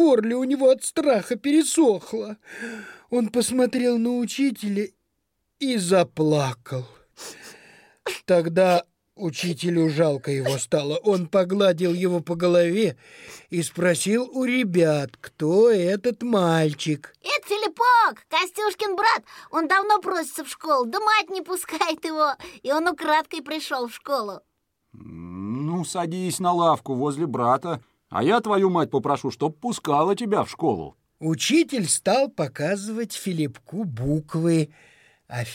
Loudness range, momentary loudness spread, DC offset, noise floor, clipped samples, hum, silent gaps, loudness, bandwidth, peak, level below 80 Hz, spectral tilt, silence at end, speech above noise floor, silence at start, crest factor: 4 LU; 13 LU; under 0.1%; -76 dBFS; under 0.1%; none; none; -23 LUFS; 16.5 kHz; -6 dBFS; -62 dBFS; -5 dB/octave; 0 s; 53 dB; 0 s; 16 dB